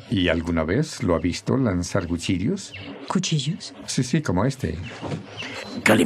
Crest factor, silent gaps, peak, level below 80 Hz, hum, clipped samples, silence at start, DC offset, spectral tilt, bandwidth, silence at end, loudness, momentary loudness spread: 20 dB; none; -4 dBFS; -48 dBFS; none; under 0.1%; 0 s; under 0.1%; -5 dB/octave; 14.5 kHz; 0 s; -24 LUFS; 10 LU